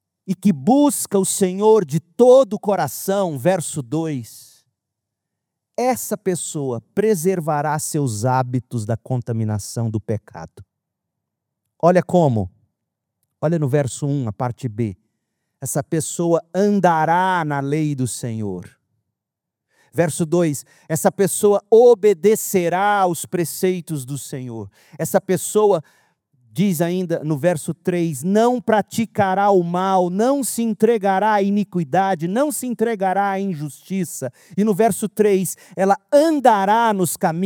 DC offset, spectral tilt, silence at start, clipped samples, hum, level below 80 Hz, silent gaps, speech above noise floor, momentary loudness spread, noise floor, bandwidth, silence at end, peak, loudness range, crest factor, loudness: under 0.1%; -5.5 dB/octave; 0.25 s; under 0.1%; none; -66 dBFS; none; 65 dB; 11 LU; -83 dBFS; over 20 kHz; 0 s; 0 dBFS; 7 LU; 18 dB; -19 LUFS